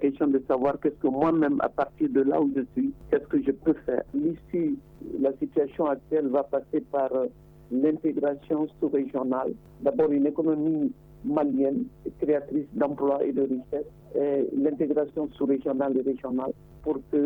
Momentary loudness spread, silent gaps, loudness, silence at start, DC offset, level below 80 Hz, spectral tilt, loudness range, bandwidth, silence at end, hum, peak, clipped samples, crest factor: 7 LU; none; -27 LUFS; 0 s; under 0.1%; -56 dBFS; -10 dB/octave; 2 LU; 3.9 kHz; 0 s; none; -10 dBFS; under 0.1%; 16 dB